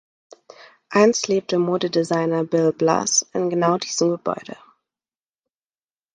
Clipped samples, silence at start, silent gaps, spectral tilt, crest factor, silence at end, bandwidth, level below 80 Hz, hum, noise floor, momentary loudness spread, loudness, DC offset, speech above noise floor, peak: under 0.1%; 0.9 s; none; -4 dB/octave; 20 dB; 1.6 s; 10.5 kHz; -68 dBFS; none; under -90 dBFS; 7 LU; -20 LUFS; under 0.1%; over 70 dB; -2 dBFS